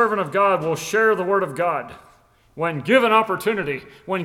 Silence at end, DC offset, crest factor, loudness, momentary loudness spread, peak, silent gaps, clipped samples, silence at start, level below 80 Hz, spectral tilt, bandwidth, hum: 0 s; under 0.1%; 18 dB; -20 LUFS; 11 LU; -2 dBFS; none; under 0.1%; 0 s; -60 dBFS; -5 dB/octave; 16.5 kHz; none